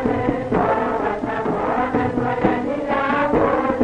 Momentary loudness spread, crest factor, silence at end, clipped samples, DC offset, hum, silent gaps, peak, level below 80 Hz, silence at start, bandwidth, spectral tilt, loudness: 5 LU; 16 dB; 0 s; under 0.1%; under 0.1%; none; none; -4 dBFS; -42 dBFS; 0 s; 9.8 kHz; -8 dB/octave; -20 LUFS